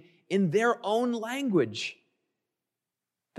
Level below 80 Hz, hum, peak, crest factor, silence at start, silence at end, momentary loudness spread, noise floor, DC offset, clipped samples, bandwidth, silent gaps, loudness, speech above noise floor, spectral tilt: -82 dBFS; none; -14 dBFS; 16 dB; 0.3 s; 1.45 s; 7 LU; -89 dBFS; under 0.1%; under 0.1%; 13.5 kHz; none; -28 LUFS; 61 dB; -5.5 dB/octave